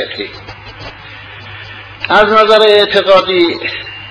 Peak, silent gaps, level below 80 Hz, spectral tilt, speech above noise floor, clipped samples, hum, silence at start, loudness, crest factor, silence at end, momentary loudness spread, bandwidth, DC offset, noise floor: 0 dBFS; none; -44 dBFS; -4.5 dB/octave; 22 dB; 0.4%; none; 0 s; -9 LUFS; 12 dB; 0 s; 23 LU; 12 kHz; under 0.1%; -31 dBFS